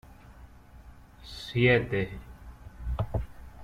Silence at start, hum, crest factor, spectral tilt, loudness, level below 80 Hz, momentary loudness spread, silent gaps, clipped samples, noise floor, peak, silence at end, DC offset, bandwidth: 0.05 s; 60 Hz at -45 dBFS; 20 dB; -7 dB/octave; -28 LUFS; -42 dBFS; 26 LU; none; under 0.1%; -51 dBFS; -12 dBFS; 0 s; under 0.1%; 14 kHz